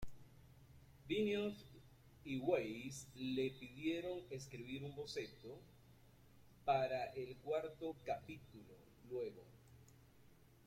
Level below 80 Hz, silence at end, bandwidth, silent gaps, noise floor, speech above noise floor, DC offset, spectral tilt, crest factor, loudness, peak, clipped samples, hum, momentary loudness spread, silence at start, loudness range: -70 dBFS; 0.2 s; 16.5 kHz; none; -68 dBFS; 24 dB; under 0.1%; -5.5 dB/octave; 22 dB; -44 LUFS; -24 dBFS; under 0.1%; none; 25 LU; 0 s; 5 LU